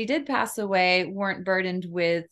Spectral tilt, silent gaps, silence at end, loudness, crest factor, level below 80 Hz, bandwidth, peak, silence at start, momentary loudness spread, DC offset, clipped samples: -4.5 dB/octave; none; 0.05 s; -25 LUFS; 18 dB; -70 dBFS; 13 kHz; -8 dBFS; 0 s; 7 LU; under 0.1%; under 0.1%